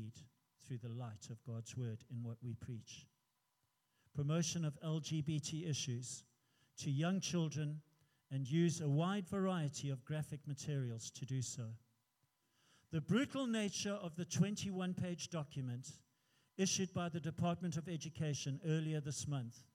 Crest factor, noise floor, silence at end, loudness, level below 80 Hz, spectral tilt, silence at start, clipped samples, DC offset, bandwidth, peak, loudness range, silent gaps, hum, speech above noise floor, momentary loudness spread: 18 dB; -84 dBFS; 0.15 s; -42 LUFS; -80 dBFS; -5 dB/octave; 0 s; under 0.1%; under 0.1%; 14.5 kHz; -24 dBFS; 6 LU; none; none; 43 dB; 12 LU